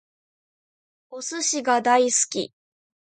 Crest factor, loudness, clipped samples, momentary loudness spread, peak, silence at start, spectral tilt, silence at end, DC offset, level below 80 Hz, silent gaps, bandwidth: 20 dB; -21 LUFS; under 0.1%; 16 LU; -6 dBFS; 1.1 s; -1 dB/octave; 0.6 s; under 0.1%; -80 dBFS; none; 9.6 kHz